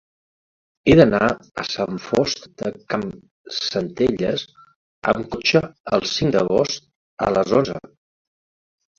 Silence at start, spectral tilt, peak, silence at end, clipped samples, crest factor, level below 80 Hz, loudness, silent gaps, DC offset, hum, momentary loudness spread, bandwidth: 0.85 s; -5.5 dB/octave; 0 dBFS; 1.2 s; under 0.1%; 22 dB; -48 dBFS; -20 LUFS; 3.31-3.44 s, 4.76-5.02 s, 5.80-5.84 s, 6.96-7.17 s; under 0.1%; none; 12 LU; 7.8 kHz